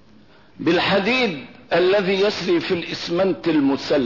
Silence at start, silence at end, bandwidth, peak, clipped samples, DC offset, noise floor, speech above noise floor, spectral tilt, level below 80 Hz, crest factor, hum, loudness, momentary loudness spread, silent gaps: 0.6 s; 0 s; 6 kHz; -8 dBFS; under 0.1%; 0.2%; -51 dBFS; 31 dB; -5.5 dB/octave; -56 dBFS; 12 dB; none; -20 LUFS; 6 LU; none